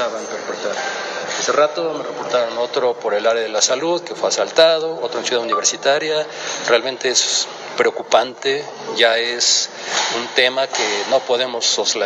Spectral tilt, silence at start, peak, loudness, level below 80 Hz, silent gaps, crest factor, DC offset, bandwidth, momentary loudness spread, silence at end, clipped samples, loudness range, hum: -0.5 dB/octave; 0 s; 0 dBFS; -18 LUFS; -76 dBFS; none; 18 dB; under 0.1%; 10.5 kHz; 9 LU; 0 s; under 0.1%; 2 LU; none